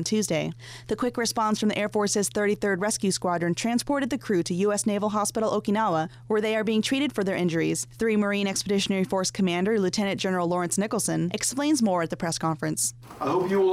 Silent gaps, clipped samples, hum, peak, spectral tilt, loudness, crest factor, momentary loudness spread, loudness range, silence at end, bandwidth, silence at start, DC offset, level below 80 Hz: none; under 0.1%; none; -16 dBFS; -4 dB/octave; -25 LUFS; 10 dB; 3 LU; 1 LU; 0 s; 16 kHz; 0 s; under 0.1%; -58 dBFS